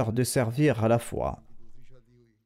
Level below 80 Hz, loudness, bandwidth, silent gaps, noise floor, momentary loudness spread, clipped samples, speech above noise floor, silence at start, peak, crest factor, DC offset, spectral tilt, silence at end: -50 dBFS; -26 LUFS; 16 kHz; none; -58 dBFS; 10 LU; under 0.1%; 32 dB; 0 s; -14 dBFS; 14 dB; under 0.1%; -6 dB/octave; 0.5 s